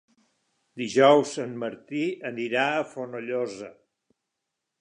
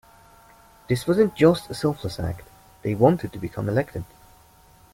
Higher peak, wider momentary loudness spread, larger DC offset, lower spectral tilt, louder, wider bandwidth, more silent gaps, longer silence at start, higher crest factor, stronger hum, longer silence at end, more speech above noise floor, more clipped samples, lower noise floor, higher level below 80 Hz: about the same, -6 dBFS vs -4 dBFS; about the same, 16 LU vs 14 LU; neither; second, -4.5 dB/octave vs -7 dB/octave; about the same, -25 LUFS vs -23 LUFS; second, 10.5 kHz vs 16.5 kHz; neither; second, 0.75 s vs 0.9 s; about the same, 22 dB vs 20 dB; neither; first, 1.1 s vs 0.9 s; first, 58 dB vs 31 dB; neither; first, -83 dBFS vs -54 dBFS; second, -78 dBFS vs -50 dBFS